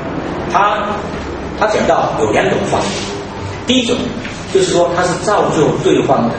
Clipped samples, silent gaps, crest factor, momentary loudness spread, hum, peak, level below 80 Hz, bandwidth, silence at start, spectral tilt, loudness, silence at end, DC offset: under 0.1%; none; 14 dB; 10 LU; none; 0 dBFS; -36 dBFS; 8.8 kHz; 0 s; -4.5 dB/octave; -15 LUFS; 0 s; under 0.1%